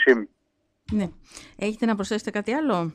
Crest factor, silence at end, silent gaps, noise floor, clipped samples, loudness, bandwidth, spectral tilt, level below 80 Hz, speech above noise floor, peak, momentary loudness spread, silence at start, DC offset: 20 dB; 0 s; none; -72 dBFS; under 0.1%; -26 LUFS; 11 kHz; -5.5 dB/octave; -54 dBFS; 48 dB; -6 dBFS; 15 LU; 0 s; under 0.1%